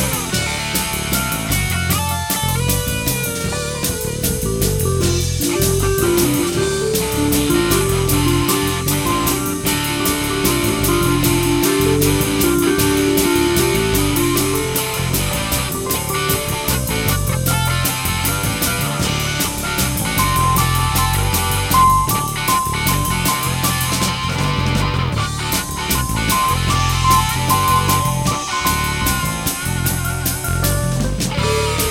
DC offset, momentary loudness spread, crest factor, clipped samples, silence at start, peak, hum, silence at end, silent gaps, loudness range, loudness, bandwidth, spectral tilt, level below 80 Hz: 0.2%; 4 LU; 16 dB; under 0.1%; 0 s; 0 dBFS; none; 0 s; none; 3 LU; -17 LUFS; 18 kHz; -4 dB/octave; -30 dBFS